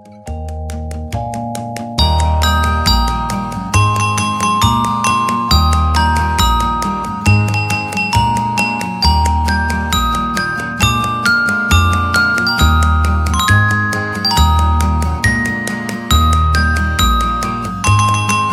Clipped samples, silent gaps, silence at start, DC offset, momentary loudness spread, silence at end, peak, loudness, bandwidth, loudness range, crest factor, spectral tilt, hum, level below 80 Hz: under 0.1%; none; 0.05 s; under 0.1%; 8 LU; 0 s; 0 dBFS; -14 LUFS; 15.5 kHz; 2 LU; 14 dB; -4.5 dB/octave; none; -20 dBFS